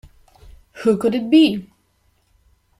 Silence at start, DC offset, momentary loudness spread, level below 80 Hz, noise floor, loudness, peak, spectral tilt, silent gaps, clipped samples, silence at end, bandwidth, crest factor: 0.75 s; under 0.1%; 8 LU; -52 dBFS; -62 dBFS; -17 LUFS; -4 dBFS; -6 dB/octave; none; under 0.1%; 1.15 s; 12.5 kHz; 18 dB